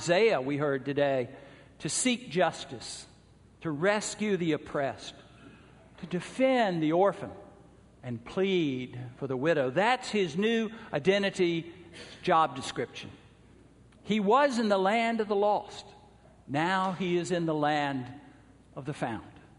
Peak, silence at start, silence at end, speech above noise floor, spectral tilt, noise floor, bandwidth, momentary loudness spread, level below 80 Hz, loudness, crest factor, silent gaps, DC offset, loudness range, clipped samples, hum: -10 dBFS; 0 s; 0.2 s; 29 dB; -4.5 dB/octave; -58 dBFS; 10.5 kHz; 16 LU; -64 dBFS; -29 LUFS; 18 dB; none; under 0.1%; 3 LU; under 0.1%; none